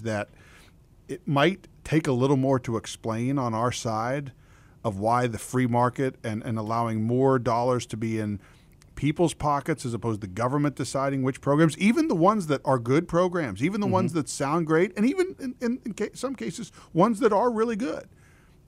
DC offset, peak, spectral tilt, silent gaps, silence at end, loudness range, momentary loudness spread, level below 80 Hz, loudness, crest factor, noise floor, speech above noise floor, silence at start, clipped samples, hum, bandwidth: under 0.1%; -6 dBFS; -6.5 dB/octave; none; 0.65 s; 4 LU; 10 LU; -56 dBFS; -26 LUFS; 20 dB; -54 dBFS; 29 dB; 0 s; under 0.1%; none; 15.5 kHz